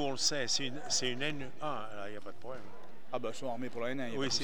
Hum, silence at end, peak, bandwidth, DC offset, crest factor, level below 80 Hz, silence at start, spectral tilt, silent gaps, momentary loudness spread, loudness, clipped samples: none; 0 s; -18 dBFS; over 20 kHz; 2%; 18 dB; -74 dBFS; 0 s; -2.5 dB/octave; none; 16 LU; -36 LUFS; under 0.1%